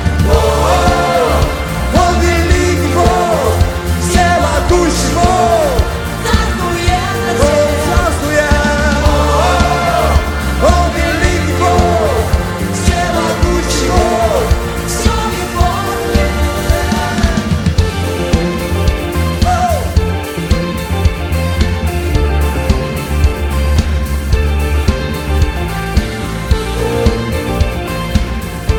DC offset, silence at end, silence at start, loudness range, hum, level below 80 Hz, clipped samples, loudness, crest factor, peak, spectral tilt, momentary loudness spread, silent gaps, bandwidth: under 0.1%; 0 s; 0 s; 4 LU; none; -18 dBFS; under 0.1%; -13 LUFS; 12 dB; 0 dBFS; -5.5 dB/octave; 6 LU; none; 18.5 kHz